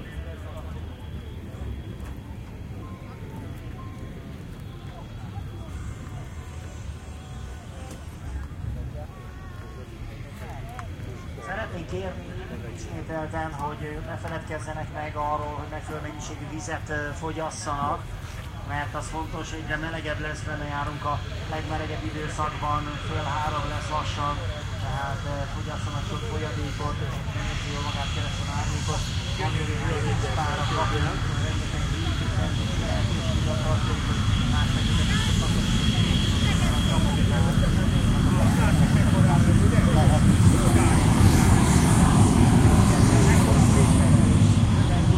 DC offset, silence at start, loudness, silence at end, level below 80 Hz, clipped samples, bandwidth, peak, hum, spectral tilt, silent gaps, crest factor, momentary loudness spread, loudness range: under 0.1%; 0 s; -24 LUFS; 0 s; -32 dBFS; under 0.1%; 15 kHz; -4 dBFS; none; -5.5 dB/octave; none; 20 dB; 20 LU; 19 LU